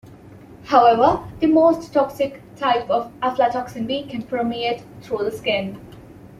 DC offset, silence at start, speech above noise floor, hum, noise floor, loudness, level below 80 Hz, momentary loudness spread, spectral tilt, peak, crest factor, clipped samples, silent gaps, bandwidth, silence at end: under 0.1%; 0.05 s; 23 dB; none; -43 dBFS; -20 LUFS; -52 dBFS; 12 LU; -6 dB/octave; -2 dBFS; 18 dB; under 0.1%; none; 14 kHz; 0.05 s